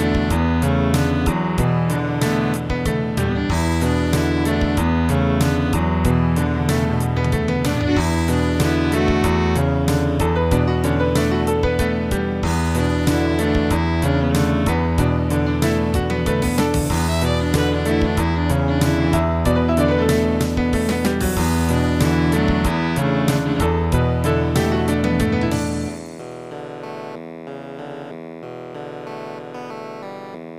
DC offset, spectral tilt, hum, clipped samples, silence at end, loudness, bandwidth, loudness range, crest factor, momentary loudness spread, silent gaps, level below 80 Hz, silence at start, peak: 0.1%; -6.5 dB/octave; none; under 0.1%; 0 s; -19 LUFS; 16 kHz; 5 LU; 16 dB; 14 LU; none; -28 dBFS; 0 s; -4 dBFS